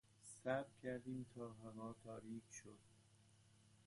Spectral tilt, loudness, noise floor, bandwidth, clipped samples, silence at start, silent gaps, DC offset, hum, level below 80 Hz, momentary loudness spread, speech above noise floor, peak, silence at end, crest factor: -5.5 dB/octave; -51 LUFS; -72 dBFS; 11.5 kHz; under 0.1%; 0.1 s; none; under 0.1%; none; -80 dBFS; 14 LU; 21 dB; -30 dBFS; 0.05 s; 22 dB